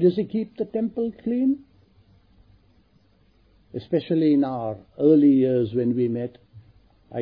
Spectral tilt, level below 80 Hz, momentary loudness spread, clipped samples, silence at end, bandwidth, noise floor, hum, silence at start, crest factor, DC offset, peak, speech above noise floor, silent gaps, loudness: -11.5 dB/octave; -62 dBFS; 15 LU; under 0.1%; 0 s; 5 kHz; -60 dBFS; none; 0 s; 16 dB; under 0.1%; -8 dBFS; 39 dB; none; -22 LUFS